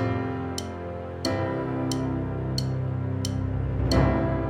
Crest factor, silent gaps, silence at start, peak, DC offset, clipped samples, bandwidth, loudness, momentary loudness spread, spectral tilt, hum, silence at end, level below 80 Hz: 18 dB; none; 0 s; -8 dBFS; under 0.1%; under 0.1%; 15.5 kHz; -28 LUFS; 9 LU; -6.5 dB/octave; none; 0 s; -36 dBFS